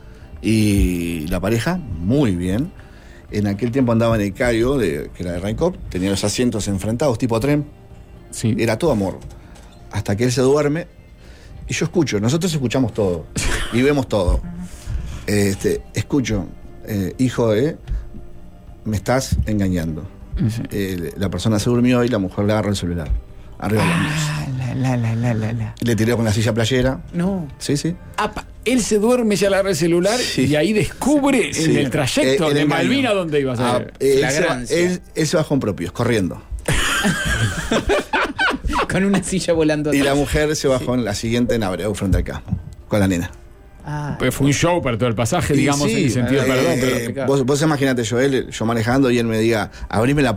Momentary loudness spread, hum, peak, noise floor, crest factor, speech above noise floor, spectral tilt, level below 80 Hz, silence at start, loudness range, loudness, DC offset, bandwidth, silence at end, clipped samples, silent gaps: 9 LU; none; -4 dBFS; -41 dBFS; 14 dB; 23 dB; -5.5 dB/octave; -32 dBFS; 0.05 s; 4 LU; -19 LUFS; under 0.1%; 16 kHz; 0 s; under 0.1%; none